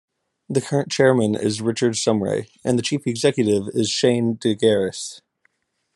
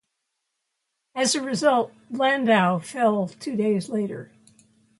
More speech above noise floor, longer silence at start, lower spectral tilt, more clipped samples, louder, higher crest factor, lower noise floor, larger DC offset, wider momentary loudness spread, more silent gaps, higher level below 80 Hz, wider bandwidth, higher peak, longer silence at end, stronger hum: second, 47 dB vs 56 dB; second, 0.5 s vs 1.15 s; about the same, -5 dB/octave vs -4.5 dB/octave; neither; first, -20 LUFS vs -23 LUFS; about the same, 18 dB vs 20 dB; second, -67 dBFS vs -79 dBFS; neither; second, 8 LU vs 11 LU; neither; first, -64 dBFS vs -72 dBFS; about the same, 12 kHz vs 11.5 kHz; about the same, -4 dBFS vs -6 dBFS; about the same, 0.75 s vs 0.75 s; neither